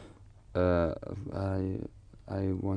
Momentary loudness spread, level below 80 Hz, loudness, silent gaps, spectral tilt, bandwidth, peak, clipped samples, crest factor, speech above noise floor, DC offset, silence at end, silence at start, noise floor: 12 LU; -50 dBFS; -33 LUFS; none; -9.5 dB/octave; 9.4 kHz; -16 dBFS; under 0.1%; 18 dB; 22 dB; under 0.1%; 0 s; 0 s; -53 dBFS